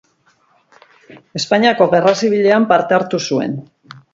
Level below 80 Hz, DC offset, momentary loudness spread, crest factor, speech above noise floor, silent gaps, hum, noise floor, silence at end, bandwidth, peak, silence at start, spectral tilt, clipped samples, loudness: -62 dBFS; under 0.1%; 12 LU; 16 dB; 43 dB; none; none; -57 dBFS; 0.15 s; 7.8 kHz; 0 dBFS; 1.1 s; -5 dB/octave; under 0.1%; -14 LUFS